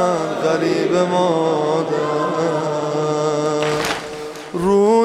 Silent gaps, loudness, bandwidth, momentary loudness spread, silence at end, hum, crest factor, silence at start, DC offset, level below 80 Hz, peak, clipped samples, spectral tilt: none; -18 LUFS; 15 kHz; 6 LU; 0 s; none; 14 dB; 0 s; under 0.1%; -54 dBFS; -4 dBFS; under 0.1%; -5.5 dB/octave